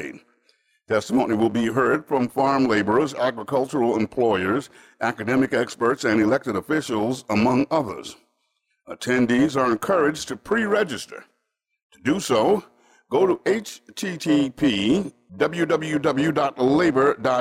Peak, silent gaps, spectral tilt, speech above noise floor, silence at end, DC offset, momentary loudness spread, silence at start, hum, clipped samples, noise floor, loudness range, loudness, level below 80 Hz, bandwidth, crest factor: -10 dBFS; 11.83-11.90 s; -5.5 dB/octave; 55 dB; 0 s; under 0.1%; 8 LU; 0 s; none; under 0.1%; -76 dBFS; 2 LU; -22 LUFS; -58 dBFS; 16 kHz; 14 dB